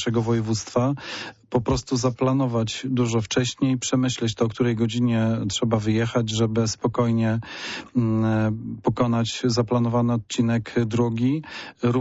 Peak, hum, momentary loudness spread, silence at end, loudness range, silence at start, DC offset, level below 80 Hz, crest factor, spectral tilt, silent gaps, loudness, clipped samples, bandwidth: -10 dBFS; none; 5 LU; 0 s; 1 LU; 0 s; under 0.1%; -50 dBFS; 14 dB; -6 dB/octave; none; -23 LUFS; under 0.1%; 8 kHz